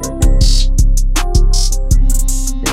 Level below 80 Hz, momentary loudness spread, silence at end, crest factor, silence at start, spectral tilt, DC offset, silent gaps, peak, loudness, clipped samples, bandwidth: -10 dBFS; 3 LU; 0 s; 10 dB; 0 s; -4 dB/octave; under 0.1%; none; 0 dBFS; -15 LUFS; under 0.1%; 15.5 kHz